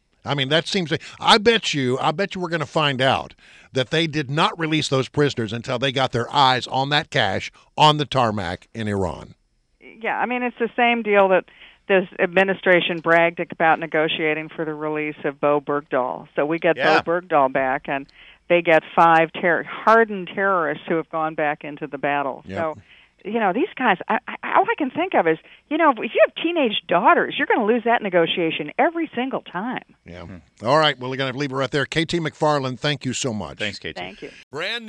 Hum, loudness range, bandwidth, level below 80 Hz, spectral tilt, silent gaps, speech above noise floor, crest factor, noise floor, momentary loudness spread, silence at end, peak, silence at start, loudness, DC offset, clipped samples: none; 5 LU; 11 kHz; -56 dBFS; -5 dB/octave; 34.43-34.51 s; 31 dB; 18 dB; -52 dBFS; 11 LU; 0 s; -2 dBFS; 0.25 s; -20 LUFS; under 0.1%; under 0.1%